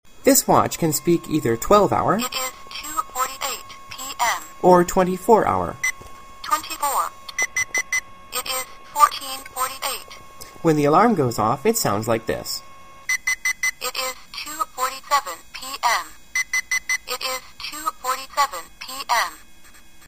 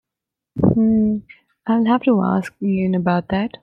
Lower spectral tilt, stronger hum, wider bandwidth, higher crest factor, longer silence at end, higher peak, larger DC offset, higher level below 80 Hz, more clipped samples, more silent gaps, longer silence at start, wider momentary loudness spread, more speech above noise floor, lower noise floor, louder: second, -3.5 dB/octave vs -9 dB/octave; neither; first, 15.5 kHz vs 5.8 kHz; about the same, 22 dB vs 18 dB; first, 0.7 s vs 0.15 s; about the same, 0 dBFS vs -2 dBFS; first, 0.6% vs under 0.1%; about the same, -48 dBFS vs -46 dBFS; neither; neither; second, 0.25 s vs 0.55 s; first, 15 LU vs 8 LU; second, 30 dB vs 67 dB; second, -48 dBFS vs -85 dBFS; second, -21 LUFS vs -18 LUFS